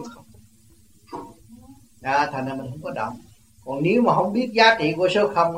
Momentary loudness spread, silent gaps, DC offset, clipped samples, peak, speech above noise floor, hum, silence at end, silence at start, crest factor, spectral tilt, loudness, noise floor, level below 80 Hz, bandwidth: 22 LU; none; 0.1%; under 0.1%; -2 dBFS; 35 dB; none; 0 s; 0 s; 20 dB; -5.5 dB/octave; -21 LUFS; -55 dBFS; -60 dBFS; 16 kHz